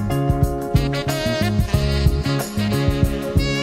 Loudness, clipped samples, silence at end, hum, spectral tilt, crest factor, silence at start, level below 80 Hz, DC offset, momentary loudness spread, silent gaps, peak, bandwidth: -20 LUFS; under 0.1%; 0 s; none; -6 dB/octave; 16 dB; 0 s; -26 dBFS; under 0.1%; 3 LU; none; -2 dBFS; 16 kHz